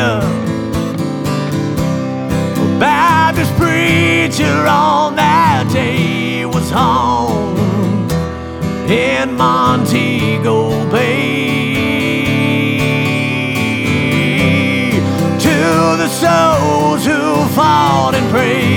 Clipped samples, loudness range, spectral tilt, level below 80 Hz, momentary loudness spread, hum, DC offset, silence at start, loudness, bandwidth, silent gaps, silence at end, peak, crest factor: under 0.1%; 3 LU; -5.5 dB/octave; -36 dBFS; 7 LU; none; under 0.1%; 0 s; -13 LUFS; 19 kHz; none; 0 s; -2 dBFS; 12 dB